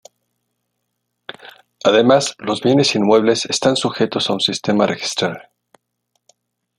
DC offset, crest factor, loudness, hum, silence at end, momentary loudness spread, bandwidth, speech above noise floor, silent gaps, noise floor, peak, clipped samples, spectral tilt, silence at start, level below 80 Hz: under 0.1%; 18 dB; -16 LUFS; 60 Hz at -45 dBFS; 1.4 s; 19 LU; 12.5 kHz; 58 dB; none; -74 dBFS; -2 dBFS; under 0.1%; -4 dB/octave; 1.3 s; -60 dBFS